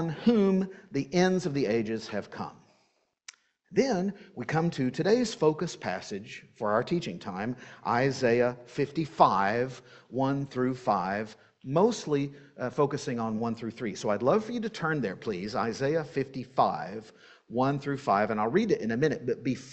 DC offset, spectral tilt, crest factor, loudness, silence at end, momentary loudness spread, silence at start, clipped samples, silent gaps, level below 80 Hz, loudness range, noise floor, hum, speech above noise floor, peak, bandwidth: under 0.1%; -6 dB/octave; 22 dB; -29 LUFS; 0 s; 11 LU; 0 s; under 0.1%; none; -64 dBFS; 3 LU; -72 dBFS; none; 43 dB; -6 dBFS; 8.4 kHz